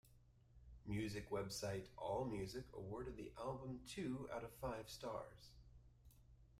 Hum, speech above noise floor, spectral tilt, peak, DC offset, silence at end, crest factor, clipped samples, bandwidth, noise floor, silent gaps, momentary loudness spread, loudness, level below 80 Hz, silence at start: none; 22 dB; -5.5 dB/octave; -34 dBFS; under 0.1%; 0 s; 16 dB; under 0.1%; 16 kHz; -70 dBFS; none; 20 LU; -49 LUFS; -64 dBFS; 0.05 s